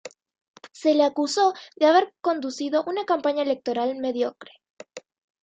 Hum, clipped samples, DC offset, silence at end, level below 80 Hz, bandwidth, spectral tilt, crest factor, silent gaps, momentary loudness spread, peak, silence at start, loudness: none; under 0.1%; under 0.1%; 0.45 s; -78 dBFS; 9.2 kHz; -3 dB/octave; 18 dB; 0.41-0.54 s, 4.70-4.77 s; 10 LU; -8 dBFS; 0.05 s; -23 LUFS